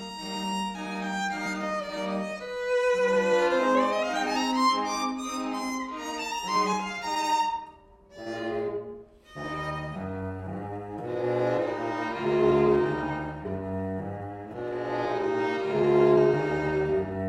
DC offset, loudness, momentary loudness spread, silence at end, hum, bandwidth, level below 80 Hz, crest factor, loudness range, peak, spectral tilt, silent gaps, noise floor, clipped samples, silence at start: under 0.1%; -28 LUFS; 13 LU; 0 s; none; 15.5 kHz; -54 dBFS; 18 dB; 7 LU; -10 dBFS; -5 dB/octave; none; -52 dBFS; under 0.1%; 0 s